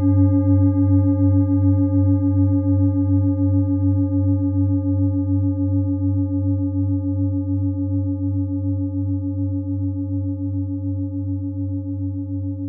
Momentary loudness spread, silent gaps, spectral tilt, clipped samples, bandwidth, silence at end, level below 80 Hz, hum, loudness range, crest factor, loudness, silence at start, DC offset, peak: 9 LU; none; -17.5 dB/octave; under 0.1%; 1.7 kHz; 0 s; -56 dBFS; none; 7 LU; 12 dB; -20 LUFS; 0 s; under 0.1%; -6 dBFS